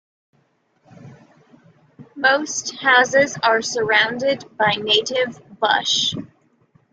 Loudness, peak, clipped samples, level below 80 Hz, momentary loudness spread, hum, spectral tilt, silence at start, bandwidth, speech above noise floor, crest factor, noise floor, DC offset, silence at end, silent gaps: -18 LUFS; -2 dBFS; under 0.1%; -64 dBFS; 8 LU; none; -1.5 dB/octave; 1 s; 9.4 kHz; 44 dB; 18 dB; -63 dBFS; under 0.1%; 0.65 s; none